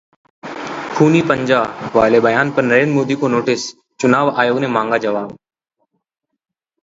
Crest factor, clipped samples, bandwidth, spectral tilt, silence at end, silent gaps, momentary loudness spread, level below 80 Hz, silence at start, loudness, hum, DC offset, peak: 16 dB; under 0.1%; 7.8 kHz; -6 dB/octave; 1.5 s; none; 14 LU; -54 dBFS; 0.45 s; -15 LUFS; none; under 0.1%; 0 dBFS